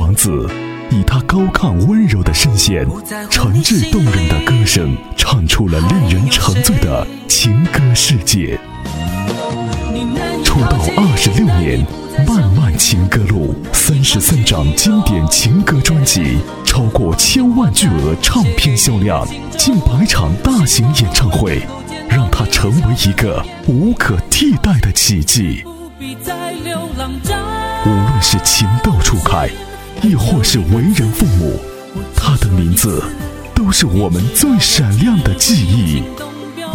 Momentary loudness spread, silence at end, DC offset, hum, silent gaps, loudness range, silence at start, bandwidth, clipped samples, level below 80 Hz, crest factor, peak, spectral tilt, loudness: 10 LU; 0 s; under 0.1%; none; none; 3 LU; 0 s; 18 kHz; under 0.1%; -22 dBFS; 12 dB; 0 dBFS; -4 dB/octave; -12 LUFS